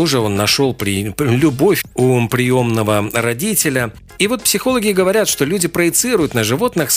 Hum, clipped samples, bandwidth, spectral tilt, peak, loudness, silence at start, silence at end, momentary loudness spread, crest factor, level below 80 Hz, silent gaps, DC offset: none; under 0.1%; 16 kHz; -4 dB/octave; 0 dBFS; -15 LUFS; 0 s; 0 s; 4 LU; 14 dB; -44 dBFS; none; under 0.1%